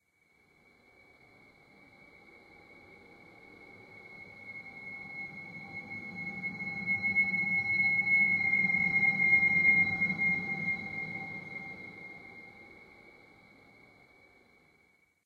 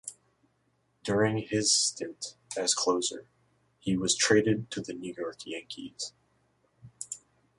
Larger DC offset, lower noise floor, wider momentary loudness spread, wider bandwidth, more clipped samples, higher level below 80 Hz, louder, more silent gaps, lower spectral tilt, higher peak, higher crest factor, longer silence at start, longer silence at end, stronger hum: neither; second, -69 dBFS vs -73 dBFS; first, 24 LU vs 17 LU; second, 7.4 kHz vs 11.5 kHz; neither; second, -70 dBFS vs -64 dBFS; about the same, -27 LUFS vs -29 LUFS; neither; first, -6 dB/octave vs -3 dB/octave; second, -16 dBFS vs -10 dBFS; about the same, 18 dB vs 22 dB; first, 2.7 s vs 0.05 s; first, 2.15 s vs 0.4 s; neither